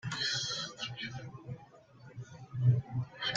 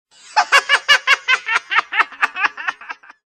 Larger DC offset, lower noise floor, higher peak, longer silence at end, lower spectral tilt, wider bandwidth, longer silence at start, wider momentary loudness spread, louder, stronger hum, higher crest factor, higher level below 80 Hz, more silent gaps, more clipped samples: neither; first, -57 dBFS vs -36 dBFS; second, -16 dBFS vs 0 dBFS; second, 0 s vs 0.35 s; first, -4 dB/octave vs 2 dB/octave; second, 7.8 kHz vs 16 kHz; second, 0.05 s vs 0.35 s; first, 19 LU vs 13 LU; second, -34 LUFS vs -15 LUFS; neither; about the same, 20 dB vs 18 dB; about the same, -66 dBFS vs -68 dBFS; neither; neither